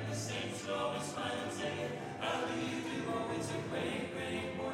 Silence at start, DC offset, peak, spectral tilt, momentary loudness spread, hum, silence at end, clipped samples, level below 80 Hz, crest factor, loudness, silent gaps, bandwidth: 0 s; under 0.1%; -24 dBFS; -4.5 dB/octave; 2 LU; none; 0 s; under 0.1%; -68 dBFS; 14 dB; -38 LUFS; none; 16 kHz